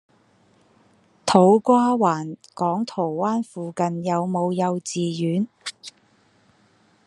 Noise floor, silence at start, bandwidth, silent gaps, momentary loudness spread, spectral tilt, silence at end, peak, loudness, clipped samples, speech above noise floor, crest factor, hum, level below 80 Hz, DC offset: -60 dBFS; 1.25 s; 11.5 kHz; none; 15 LU; -6 dB/octave; 1.15 s; 0 dBFS; -22 LUFS; under 0.1%; 39 dB; 22 dB; none; -68 dBFS; under 0.1%